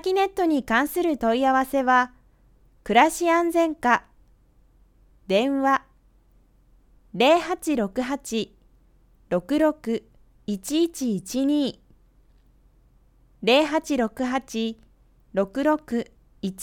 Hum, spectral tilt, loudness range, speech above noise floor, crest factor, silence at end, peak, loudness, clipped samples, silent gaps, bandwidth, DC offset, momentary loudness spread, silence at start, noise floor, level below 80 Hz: none; -4 dB/octave; 6 LU; 36 dB; 20 dB; 0 s; -4 dBFS; -23 LUFS; under 0.1%; none; 18.5 kHz; under 0.1%; 11 LU; 0.05 s; -58 dBFS; -54 dBFS